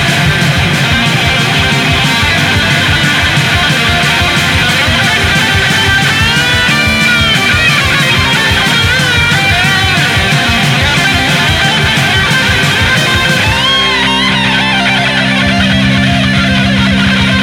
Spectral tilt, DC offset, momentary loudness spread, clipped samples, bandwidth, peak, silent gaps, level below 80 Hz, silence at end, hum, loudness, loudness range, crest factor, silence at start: -3.5 dB/octave; under 0.1%; 2 LU; under 0.1%; 17 kHz; 0 dBFS; none; -26 dBFS; 0 s; none; -8 LUFS; 1 LU; 10 dB; 0 s